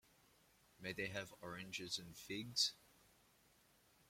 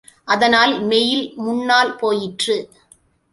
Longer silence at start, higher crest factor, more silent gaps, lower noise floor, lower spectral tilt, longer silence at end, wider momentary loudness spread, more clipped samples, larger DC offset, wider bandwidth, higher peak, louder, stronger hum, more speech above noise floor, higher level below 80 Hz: first, 0.8 s vs 0.25 s; first, 24 dB vs 16 dB; neither; first, -73 dBFS vs -54 dBFS; about the same, -2 dB/octave vs -3 dB/octave; first, 1.15 s vs 0.65 s; first, 13 LU vs 8 LU; neither; neither; first, 16.5 kHz vs 11.5 kHz; second, -24 dBFS vs -2 dBFS; second, -44 LUFS vs -17 LUFS; neither; second, 27 dB vs 37 dB; second, -78 dBFS vs -60 dBFS